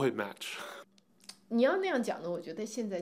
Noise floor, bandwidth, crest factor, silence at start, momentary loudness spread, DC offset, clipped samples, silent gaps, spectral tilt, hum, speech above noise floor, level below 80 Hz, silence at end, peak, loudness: -59 dBFS; 16 kHz; 18 dB; 0 s; 23 LU; under 0.1%; under 0.1%; none; -4.5 dB/octave; none; 26 dB; under -90 dBFS; 0 s; -16 dBFS; -34 LUFS